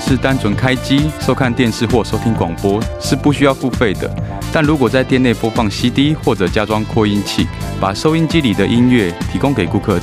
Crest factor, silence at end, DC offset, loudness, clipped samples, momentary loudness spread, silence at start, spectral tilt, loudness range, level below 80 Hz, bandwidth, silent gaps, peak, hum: 14 dB; 0 s; under 0.1%; -15 LUFS; under 0.1%; 5 LU; 0 s; -6 dB/octave; 1 LU; -30 dBFS; 15.5 kHz; none; 0 dBFS; none